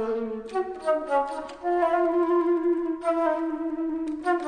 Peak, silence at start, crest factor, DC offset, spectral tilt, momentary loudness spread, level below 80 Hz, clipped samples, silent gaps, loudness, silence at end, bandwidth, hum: -12 dBFS; 0 s; 14 dB; under 0.1%; -5.5 dB/octave; 8 LU; -60 dBFS; under 0.1%; none; -26 LUFS; 0 s; 9.8 kHz; none